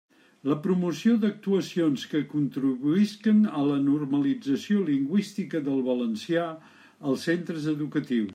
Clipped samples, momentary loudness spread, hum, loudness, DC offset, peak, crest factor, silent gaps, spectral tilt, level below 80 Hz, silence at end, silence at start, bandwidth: under 0.1%; 6 LU; none; -26 LUFS; under 0.1%; -12 dBFS; 14 dB; none; -7 dB/octave; -76 dBFS; 0 s; 0.45 s; 13.5 kHz